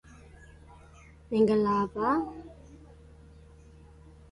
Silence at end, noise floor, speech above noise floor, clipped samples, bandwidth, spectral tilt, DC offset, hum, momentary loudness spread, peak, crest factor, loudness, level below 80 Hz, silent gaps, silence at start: 1.55 s; -53 dBFS; 27 dB; under 0.1%; 11 kHz; -8 dB/octave; under 0.1%; none; 24 LU; -12 dBFS; 20 dB; -27 LUFS; -54 dBFS; none; 1.3 s